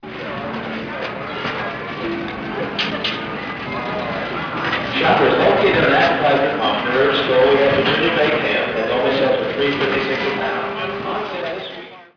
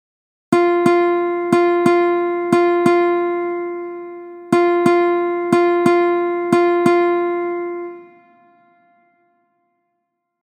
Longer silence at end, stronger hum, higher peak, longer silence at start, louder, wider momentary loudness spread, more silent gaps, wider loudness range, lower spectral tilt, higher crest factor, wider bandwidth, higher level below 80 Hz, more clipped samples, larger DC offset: second, 0.1 s vs 2.45 s; neither; second, -4 dBFS vs 0 dBFS; second, 0 s vs 0.5 s; about the same, -18 LUFS vs -16 LUFS; about the same, 12 LU vs 12 LU; neither; first, 9 LU vs 6 LU; about the same, -6 dB/octave vs -6.5 dB/octave; about the same, 16 dB vs 18 dB; second, 5.4 kHz vs 10 kHz; first, -48 dBFS vs -70 dBFS; neither; neither